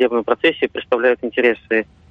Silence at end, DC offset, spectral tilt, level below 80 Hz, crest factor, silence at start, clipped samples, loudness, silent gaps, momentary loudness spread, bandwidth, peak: 0.3 s; under 0.1%; -6 dB/octave; -56 dBFS; 16 dB; 0 s; under 0.1%; -18 LUFS; none; 4 LU; 5.2 kHz; -2 dBFS